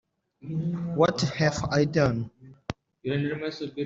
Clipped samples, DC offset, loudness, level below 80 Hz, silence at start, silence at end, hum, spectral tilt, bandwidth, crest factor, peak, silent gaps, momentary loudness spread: under 0.1%; under 0.1%; -27 LUFS; -54 dBFS; 0.45 s; 0 s; none; -6 dB/octave; 7.8 kHz; 20 dB; -8 dBFS; none; 16 LU